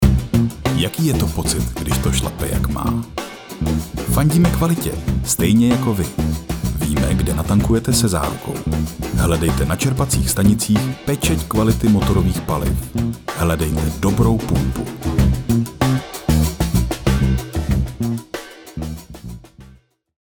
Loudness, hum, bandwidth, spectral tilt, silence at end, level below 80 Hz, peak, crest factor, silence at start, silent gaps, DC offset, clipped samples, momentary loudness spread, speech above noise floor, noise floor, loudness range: -18 LUFS; none; over 20 kHz; -5.5 dB/octave; 0.55 s; -26 dBFS; 0 dBFS; 18 dB; 0 s; none; under 0.1%; under 0.1%; 9 LU; 31 dB; -48 dBFS; 3 LU